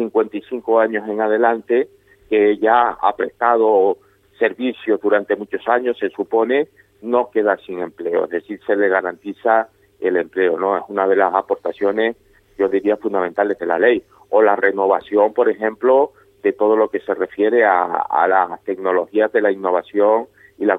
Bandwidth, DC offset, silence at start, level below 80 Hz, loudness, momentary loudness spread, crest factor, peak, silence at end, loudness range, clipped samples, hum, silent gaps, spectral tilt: 4 kHz; under 0.1%; 0 s; -62 dBFS; -18 LUFS; 8 LU; 16 dB; 0 dBFS; 0 s; 3 LU; under 0.1%; none; none; -7.5 dB/octave